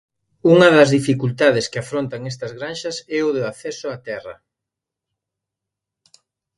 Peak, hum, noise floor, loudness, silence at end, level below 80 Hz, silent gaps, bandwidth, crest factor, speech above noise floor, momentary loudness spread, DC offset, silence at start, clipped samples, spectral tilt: 0 dBFS; none; -84 dBFS; -18 LUFS; 2.25 s; -60 dBFS; none; 11.5 kHz; 20 dB; 67 dB; 18 LU; under 0.1%; 0.45 s; under 0.1%; -5.5 dB/octave